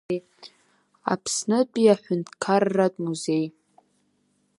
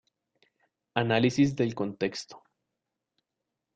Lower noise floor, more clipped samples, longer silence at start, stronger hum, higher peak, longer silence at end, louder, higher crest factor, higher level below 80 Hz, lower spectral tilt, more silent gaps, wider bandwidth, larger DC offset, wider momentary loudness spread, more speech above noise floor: second, -69 dBFS vs -86 dBFS; neither; second, 0.1 s vs 0.95 s; neither; first, -6 dBFS vs -10 dBFS; second, 1.1 s vs 1.4 s; first, -24 LUFS vs -28 LUFS; about the same, 20 dB vs 22 dB; second, -72 dBFS vs -66 dBFS; about the same, -5 dB/octave vs -6 dB/octave; neither; first, 11.5 kHz vs 9 kHz; neither; about the same, 12 LU vs 12 LU; second, 45 dB vs 59 dB